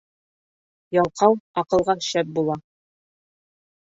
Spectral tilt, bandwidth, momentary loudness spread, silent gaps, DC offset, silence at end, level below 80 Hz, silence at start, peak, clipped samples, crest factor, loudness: -5 dB/octave; 8 kHz; 7 LU; 1.40-1.54 s; under 0.1%; 1.2 s; -58 dBFS; 0.9 s; -2 dBFS; under 0.1%; 22 dB; -22 LUFS